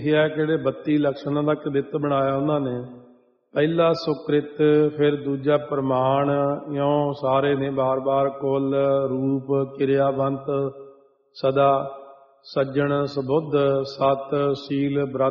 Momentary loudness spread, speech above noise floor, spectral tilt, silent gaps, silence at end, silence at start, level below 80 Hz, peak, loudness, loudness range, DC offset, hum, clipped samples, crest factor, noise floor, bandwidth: 5 LU; 33 dB; -6 dB/octave; none; 0 s; 0 s; -62 dBFS; -6 dBFS; -22 LUFS; 3 LU; under 0.1%; none; under 0.1%; 16 dB; -55 dBFS; 6 kHz